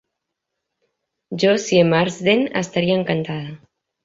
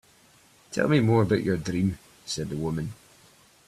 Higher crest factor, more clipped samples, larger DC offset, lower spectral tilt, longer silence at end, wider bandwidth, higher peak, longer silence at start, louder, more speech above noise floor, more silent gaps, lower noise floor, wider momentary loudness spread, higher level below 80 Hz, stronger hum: about the same, 18 dB vs 18 dB; neither; neither; about the same, -5.5 dB/octave vs -6.5 dB/octave; second, 0.5 s vs 0.75 s; second, 7.8 kHz vs 14 kHz; first, -2 dBFS vs -10 dBFS; first, 1.3 s vs 0.7 s; first, -18 LUFS vs -26 LUFS; first, 61 dB vs 33 dB; neither; first, -80 dBFS vs -58 dBFS; about the same, 13 LU vs 13 LU; second, -60 dBFS vs -54 dBFS; neither